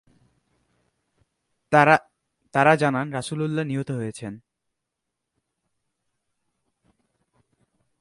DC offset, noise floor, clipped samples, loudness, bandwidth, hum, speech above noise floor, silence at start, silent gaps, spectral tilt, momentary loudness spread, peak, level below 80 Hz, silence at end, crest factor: under 0.1%; -82 dBFS; under 0.1%; -22 LUFS; 11.5 kHz; none; 61 dB; 1.7 s; none; -6 dB/octave; 14 LU; -2 dBFS; -66 dBFS; 3.6 s; 26 dB